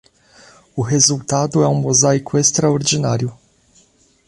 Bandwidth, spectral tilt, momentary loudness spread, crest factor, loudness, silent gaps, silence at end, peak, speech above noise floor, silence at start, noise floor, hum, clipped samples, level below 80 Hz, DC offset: 11.5 kHz; -4 dB/octave; 9 LU; 18 dB; -16 LUFS; none; 0.95 s; 0 dBFS; 39 dB; 0.75 s; -54 dBFS; none; under 0.1%; -52 dBFS; under 0.1%